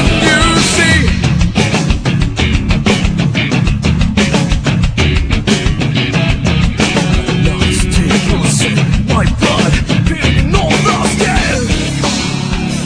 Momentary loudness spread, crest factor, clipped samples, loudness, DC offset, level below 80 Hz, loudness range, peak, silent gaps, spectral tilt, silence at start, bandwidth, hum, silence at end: 5 LU; 12 dB; under 0.1%; -12 LUFS; under 0.1%; -18 dBFS; 1 LU; 0 dBFS; none; -4.5 dB/octave; 0 s; 10.5 kHz; none; 0 s